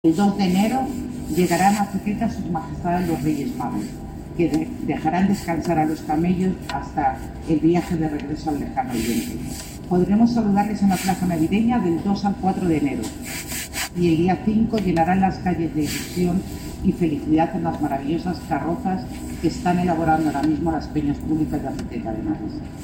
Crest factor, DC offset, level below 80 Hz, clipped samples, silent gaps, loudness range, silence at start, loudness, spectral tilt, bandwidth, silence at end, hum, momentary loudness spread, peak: 16 dB; under 0.1%; -40 dBFS; under 0.1%; none; 3 LU; 0.05 s; -22 LUFS; -6.5 dB/octave; 17 kHz; 0 s; none; 9 LU; -6 dBFS